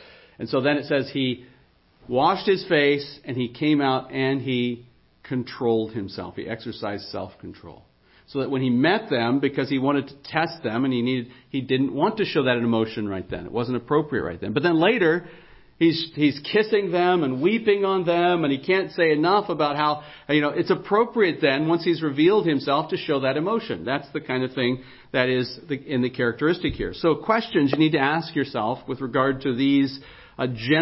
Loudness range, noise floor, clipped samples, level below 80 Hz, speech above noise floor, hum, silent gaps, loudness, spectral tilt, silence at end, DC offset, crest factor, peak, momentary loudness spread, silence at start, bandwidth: 4 LU; -57 dBFS; under 0.1%; -54 dBFS; 35 dB; none; none; -23 LUFS; -10.5 dB/octave; 0 s; under 0.1%; 18 dB; -4 dBFS; 11 LU; 0 s; 5.8 kHz